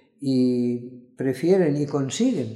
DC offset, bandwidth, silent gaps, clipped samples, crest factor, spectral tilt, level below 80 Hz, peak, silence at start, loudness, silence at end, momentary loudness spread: under 0.1%; 12 kHz; none; under 0.1%; 14 dB; -6.5 dB/octave; -72 dBFS; -8 dBFS; 0.2 s; -23 LUFS; 0 s; 9 LU